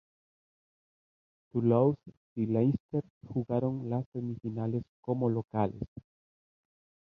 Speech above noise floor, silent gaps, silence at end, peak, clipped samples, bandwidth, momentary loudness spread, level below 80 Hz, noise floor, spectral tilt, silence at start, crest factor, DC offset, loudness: over 59 dB; 2.17-2.36 s, 2.80-2.89 s, 3.10-3.21 s, 4.06-4.12 s, 4.88-5.03 s, 5.88-5.96 s; 1.05 s; -12 dBFS; under 0.1%; 4.8 kHz; 11 LU; -62 dBFS; under -90 dBFS; -12 dB/octave; 1.55 s; 20 dB; under 0.1%; -32 LUFS